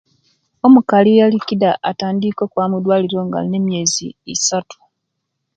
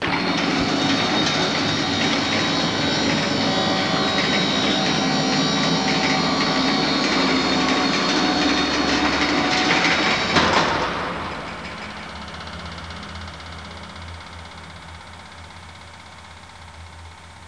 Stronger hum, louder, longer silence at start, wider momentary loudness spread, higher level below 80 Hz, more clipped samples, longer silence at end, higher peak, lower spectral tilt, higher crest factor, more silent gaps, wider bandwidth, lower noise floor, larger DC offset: neither; first, -15 LUFS vs -19 LUFS; first, 0.65 s vs 0 s; second, 9 LU vs 21 LU; second, -60 dBFS vs -46 dBFS; neither; first, 0.85 s vs 0 s; about the same, 0 dBFS vs -2 dBFS; about the same, -4.5 dB/octave vs -3.5 dB/octave; about the same, 16 dB vs 20 dB; neither; second, 9.2 kHz vs 10.5 kHz; first, -75 dBFS vs -41 dBFS; second, under 0.1% vs 0.2%